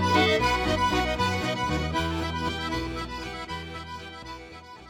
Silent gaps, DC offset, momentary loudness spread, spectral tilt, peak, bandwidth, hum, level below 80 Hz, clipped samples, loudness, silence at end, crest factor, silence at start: none; under 0.1%; 17 LU; -4.5 dB/octave; -8 dBFS; 19 kHz; none; -40 dBFS; under 0.1%; -27 LUFS; 0 s; 20 dB; 0 s